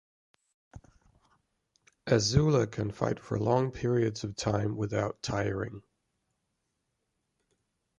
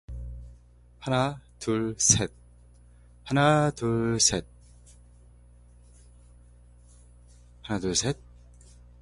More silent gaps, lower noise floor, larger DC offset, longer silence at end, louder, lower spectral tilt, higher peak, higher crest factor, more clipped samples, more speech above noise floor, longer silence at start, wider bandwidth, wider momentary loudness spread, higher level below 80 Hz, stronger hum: neither; first, -81 dBFS vs -54 dBFS; neither; first, 2.2 s vs 0.85 s; second, -30 LUFS vs -25 LUFS; first, -6 dB/octave vs -3.5 dB/octave; second, -10 dBFS vs -4 dBFS; about the same, 22 dB vs 26 dB; neither; first, 52 dB vs 29 dB; first, 0.75 s vs 0.1 s; about the same, 11 kHz vs 11.5 kHz; second, 9 LU vs 20 LU; about the same, -52 dBFS vs -48 dBFS; second, none vs 60 Hz at -50 dBFS